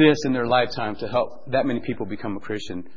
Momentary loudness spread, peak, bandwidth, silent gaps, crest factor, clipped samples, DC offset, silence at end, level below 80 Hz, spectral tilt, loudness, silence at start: 10 LU; -2 dBFS; 7.6 kHz; none; 20 dB; under 0.1%; 2%; 0.15 s; -52 dBFS; -6 dB/octave; -24 LUFS; 0 s